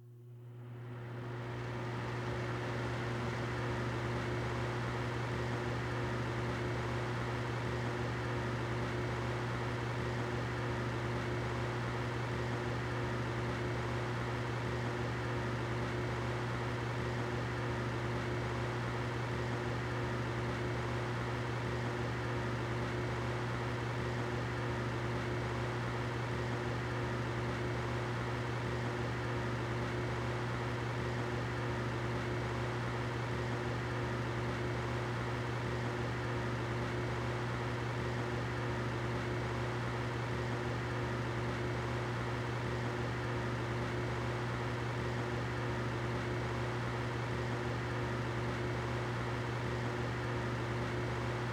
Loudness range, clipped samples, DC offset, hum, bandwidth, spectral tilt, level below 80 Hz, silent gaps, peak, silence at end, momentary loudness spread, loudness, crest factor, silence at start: 0 LU; under 0.1%; under 0.1%; none; 11 kHz; -6.5 dB/octave; -52 dBFS; none; -26 dBFS; 0 s; 0 LU; -37 LUFS; 12 dB; 0 s